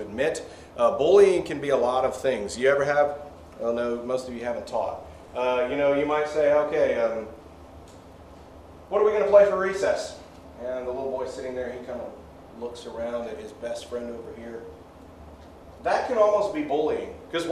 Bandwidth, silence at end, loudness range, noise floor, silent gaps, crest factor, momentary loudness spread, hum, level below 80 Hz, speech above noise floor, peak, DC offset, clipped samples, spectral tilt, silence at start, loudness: 12.5 kHz; 0 s; 12 LU; -46 dBFS; none; 20 dB; 19 LU; none; -54 dBFS; 22 dB; -6 dBFS; under 0.1%; under 0.1%; -5 dB/octave; 0 s; -25 LUFS